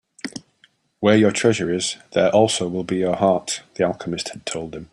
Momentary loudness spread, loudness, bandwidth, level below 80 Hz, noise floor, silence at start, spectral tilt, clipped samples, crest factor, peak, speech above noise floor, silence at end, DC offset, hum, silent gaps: 14 LU; -20 LUFS; 11.5 kHz; -58 dBFS; -59 dBFS; 0.25 s; -4.5 dB/octave; under 0.1%; 18 dB; -2 dBFS; 40 dB; 0.05 s; under 0.1%; none; none